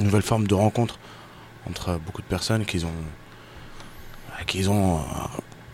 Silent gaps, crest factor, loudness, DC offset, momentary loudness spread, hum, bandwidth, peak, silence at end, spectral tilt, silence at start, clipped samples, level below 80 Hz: none; 20 dB; -25 LUFS; under 0.1%; 23 LU; none; 16 kHz; -6 dBFS; 0 s; -5.5 dB/octave; 0 s; under 0.1%; -44 dBFS